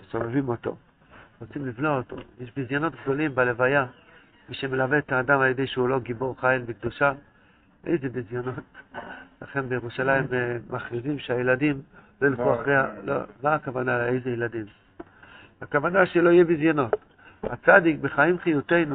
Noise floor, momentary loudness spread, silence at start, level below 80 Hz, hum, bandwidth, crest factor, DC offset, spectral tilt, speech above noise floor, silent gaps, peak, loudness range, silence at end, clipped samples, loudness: -58 dBFS; 17 LU; 0.15 s; -58 dBFS; none; 4.5 kHz; 24 dB; under 0.1%; -5 dB/octave; 34 dB; none; -2 dBFS; 7 LU; 0 s; under 0.1%; -24 LUFS